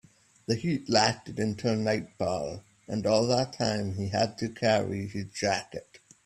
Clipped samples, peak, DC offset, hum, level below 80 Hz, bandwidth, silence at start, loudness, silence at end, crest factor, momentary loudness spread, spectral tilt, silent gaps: under 0.1%; -8 dBFS; under 0.1%; none; -62 dBFS; 13 kHz; 0.5 s; -29 LUFS; 0.3 s; 20 dB; 11 LU; -5 dB/octave; none